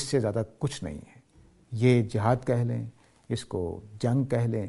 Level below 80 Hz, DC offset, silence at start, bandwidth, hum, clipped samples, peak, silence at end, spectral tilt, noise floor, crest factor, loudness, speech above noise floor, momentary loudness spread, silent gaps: -54 dBFS; under 0.1%; 0 s; 11.5 kHz; none; under 0.1%; -8 dBFS; 0 s; -7 dB/octave; -58 dBFS; 20 dB; -28 LUFS; 31 dB; 14 LU; none